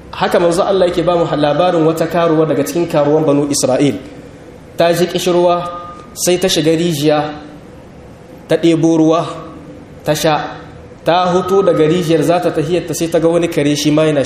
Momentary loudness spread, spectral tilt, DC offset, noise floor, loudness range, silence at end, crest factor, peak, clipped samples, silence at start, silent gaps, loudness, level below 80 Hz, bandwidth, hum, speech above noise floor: 13 LU; -5 dB/octave; under 0.1%; -36 dBFS; 3 LU; 0 s; 14 dB; 0 dBFS; under 0.1%; 0 s; none; -13 LUFS; -44 dBFS; 15.5 kHz; none; 23 dB